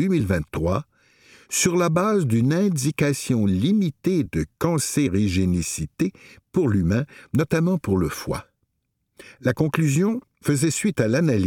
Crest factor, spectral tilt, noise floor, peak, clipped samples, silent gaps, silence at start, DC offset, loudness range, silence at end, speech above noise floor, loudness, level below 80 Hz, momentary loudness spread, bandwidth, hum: 18 dB; -6 dB/octave; -75 dBFS; -4 dBFS; under 0.1%; none; 0 s; under 0.1%; 3 LU; 0 s; 54 dB; -22 LUFS; -46 dBFS; 7 LU; 17.5 kHz; none